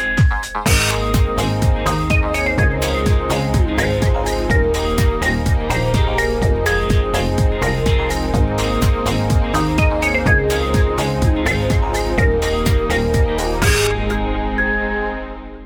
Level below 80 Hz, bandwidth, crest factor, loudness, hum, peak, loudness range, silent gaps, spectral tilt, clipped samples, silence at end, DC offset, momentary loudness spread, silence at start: -22 dBFS; 19 kHz; 14 dB; -17 LUFS; none; -2 dBFS; 1 LU; none; -5.5 dB/octave; under 0.1%; 0 s; under 0.1%; 3 LU; 0 s